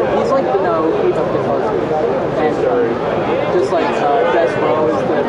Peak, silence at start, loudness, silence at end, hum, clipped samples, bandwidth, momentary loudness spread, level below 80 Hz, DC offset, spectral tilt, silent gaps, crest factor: -2 dBFS; 0 s; -15 LUFS; 0 s; none; under 0.1%; 10.5 kHz; 3 LU; -46 dBFS; under 0.1%; -7 dB/octave; none; 12 dB